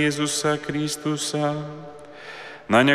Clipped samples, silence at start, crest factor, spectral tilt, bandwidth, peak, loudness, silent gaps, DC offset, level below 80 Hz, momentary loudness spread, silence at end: under 0.1%; 0 s; 18 dB; -4 dB/octave; 15.5 kHz; -4 dBFS; -24 LUFS; none; under 0.1%; -58 dBFS; 18 LU; 0 s